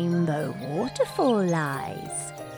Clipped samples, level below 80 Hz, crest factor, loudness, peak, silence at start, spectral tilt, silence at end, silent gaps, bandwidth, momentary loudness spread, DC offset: under 0.1%; -60 dBFS; 14 dB; -27 LUFS; -12 dBFS; 0 s; -6 dB/octave; 0 s; none; 17.5 kHz; 9 LU; under 0.1%